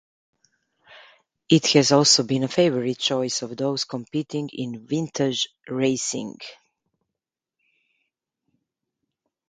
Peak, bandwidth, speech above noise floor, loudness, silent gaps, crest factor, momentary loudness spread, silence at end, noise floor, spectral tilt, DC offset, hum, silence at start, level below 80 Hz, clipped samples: -2 dBFS; 9.6 kHz; 64 dB; -22 LUFS; none; 24 dB; 14 LU; 2.95 s; -86 dBFS; -4 dB/octave; under 0.1%; none; 0.9 s; -68 dBFS; under 0.1%